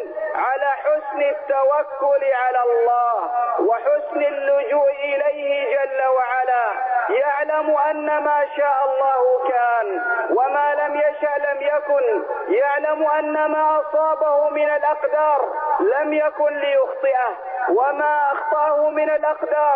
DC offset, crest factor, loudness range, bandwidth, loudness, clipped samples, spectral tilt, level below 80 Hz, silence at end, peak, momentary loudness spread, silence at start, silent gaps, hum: under 0.1%; 10 dB; 1 LU; 3.8 kHz; -19 LUFS; under 0.1%; -6.5 dB/octave; -68 dBFS; 0 s; -8 dBFS; 3 LU; 0 s; none; none